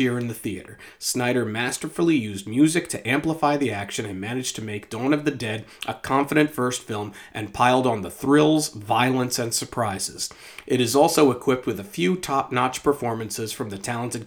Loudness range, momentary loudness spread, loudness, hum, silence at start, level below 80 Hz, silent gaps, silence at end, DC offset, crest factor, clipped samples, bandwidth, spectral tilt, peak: 3 LU; 12 LU; -23 LUFS; none; 0 s; -58 dBFS; none; 0 s; under 0.1%; 20 dB; under 0.1%; over 20 kHz; -4.5 dB/octave; -2 dBFS